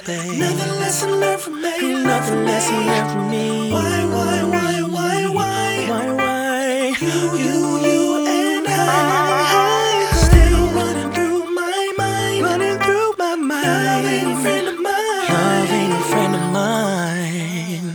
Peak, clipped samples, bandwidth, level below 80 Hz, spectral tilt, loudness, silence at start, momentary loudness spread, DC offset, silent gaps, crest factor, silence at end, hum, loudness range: 0 dBFS; under 0.1%; over 20 kHz; -26 dBFS; -4.5 dB/octave; -18 LUFS; 0 s; 5 LU; under 0.1%; none; 18 dB; 0 s; none; 3 LU